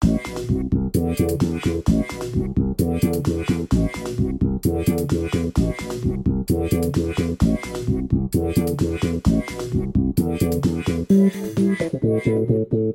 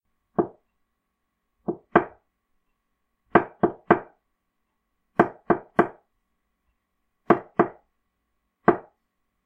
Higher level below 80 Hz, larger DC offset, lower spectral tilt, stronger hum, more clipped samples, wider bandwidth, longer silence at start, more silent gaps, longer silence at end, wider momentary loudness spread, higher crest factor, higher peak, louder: first, -32 dBFS vs -62 dBFS; neither; second, -7.5 dB/octave vs -9 dB/octave; neither; neither; first, 17 kHz vs 4.3 kHz; second, 0 s vs 0.4 s; neither; second, 0 s vs 0.65 s; second, 4 LU vs 11 LU; second, 14 dB vs 26 dB; second, -6 dBFS vs 0 dBFS; first, -22 LUFS vs -25 LUFS